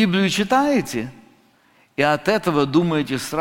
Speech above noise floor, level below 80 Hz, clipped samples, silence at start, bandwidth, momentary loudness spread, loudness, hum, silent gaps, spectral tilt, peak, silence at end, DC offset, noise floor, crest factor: 38 dB; -52 dBFS; under 0.1%; 0 s; 17 kHz; 10 LU; -20 LUFS; none; none; -5 dB/octave; -2 dBFS; 0 s; under 0.1%; -57 dBFS; 18 dB